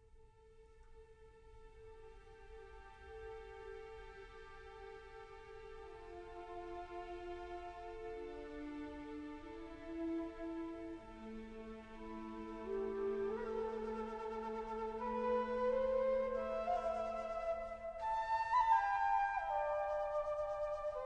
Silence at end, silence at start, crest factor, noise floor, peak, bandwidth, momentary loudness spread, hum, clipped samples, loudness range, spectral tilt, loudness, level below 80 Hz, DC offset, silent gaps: 0 s; 0 s; 20 dB; -63 dBFS; -22 dBFS; 9.6 kHz; 19 LU; none; under 0.1%; 18 LU; -6 dB/octave; -41 LUFS; -60 dBFS; under 0.1%; none